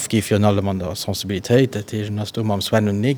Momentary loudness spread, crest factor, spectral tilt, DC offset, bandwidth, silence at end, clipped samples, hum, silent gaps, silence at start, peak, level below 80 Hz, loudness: 8 LU; 18 dB; -5.5 dB/octave; under 0.1%; over 20 kHz; 0 s; under 0.1%; none; none; 0 s; -2 dBFS; -54 dBFS; -20 LUFS